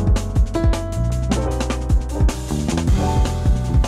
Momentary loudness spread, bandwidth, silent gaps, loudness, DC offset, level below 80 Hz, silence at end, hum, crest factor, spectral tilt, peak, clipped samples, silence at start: 3 LU; 13 kHz; none; -20 LUFS; under 0.1%; -20 dBFS; 0 s; none; 10 dB; -6.5 dB/octave; -6 dBFS; under 0.1%; 0 s